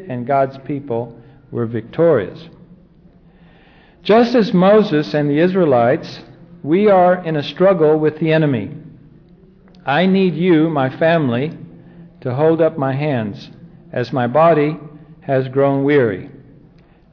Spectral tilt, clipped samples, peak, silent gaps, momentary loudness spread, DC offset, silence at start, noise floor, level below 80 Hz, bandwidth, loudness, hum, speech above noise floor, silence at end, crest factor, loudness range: -8.5 dB/octave; under 0.1%; -4 dBFS; none; 17 LU; under 0.1%; 0 s; -47 dBFS; -54 dBFS; 5.4 kHz; -16 LUFS; none; 32 dB; 0.85 s; 12 dB; 5 LU